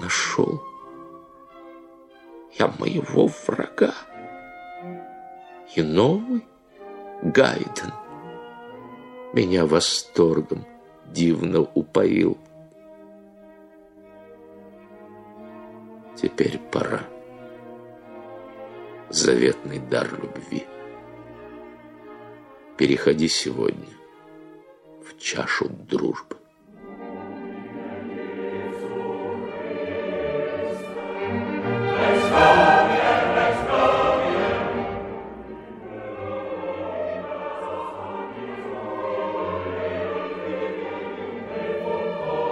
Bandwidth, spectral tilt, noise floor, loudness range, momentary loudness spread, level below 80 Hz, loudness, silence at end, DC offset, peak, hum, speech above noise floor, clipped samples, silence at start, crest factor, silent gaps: 12 kHz; -4.5 dB/octave; -49 dBFS; 12 LU; 23 LU; -54 dBFS; -23 LUFS; 0 s; under 0.1%; -2 dBFS; none; 27 dB; under 0.1%; 0 s; 22 dB; none